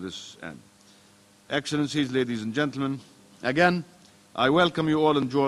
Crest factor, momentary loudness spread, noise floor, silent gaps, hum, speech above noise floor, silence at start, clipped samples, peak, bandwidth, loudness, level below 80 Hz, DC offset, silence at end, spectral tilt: 22 dB; 17 LU; -57 dBFS; none; none; 32 dB; 0 s; under 0.1%; -4 dBFS; 12 kHz; -25 LUFS; -60 dBFS; under 0.1%; 0 s; -5.5 dB/octave